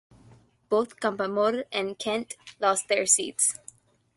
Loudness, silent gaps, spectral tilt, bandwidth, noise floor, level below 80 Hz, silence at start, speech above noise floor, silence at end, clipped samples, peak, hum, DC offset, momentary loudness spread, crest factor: -26 LUFS; none; -1.5 dB/octave; 12 kHz; -56 dBFS; -70 dBFS; 0.7 s; 30 dB; 0.6 s; under 0.1%; -8 dBFS; none; under 0.1%; 9 LU; 20 dB